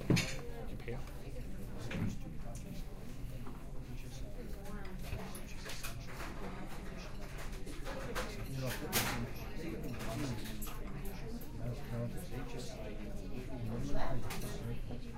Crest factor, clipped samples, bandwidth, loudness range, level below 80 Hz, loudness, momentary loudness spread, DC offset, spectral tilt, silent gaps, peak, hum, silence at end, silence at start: 22 dB; under 0.1%; 16 kHz; 6 LU; -44 dBFS; -43 LUFS; 8 LU; under 0.1%; -5 dB/octave; none; -18 dBFS; none; 0 s; 0 s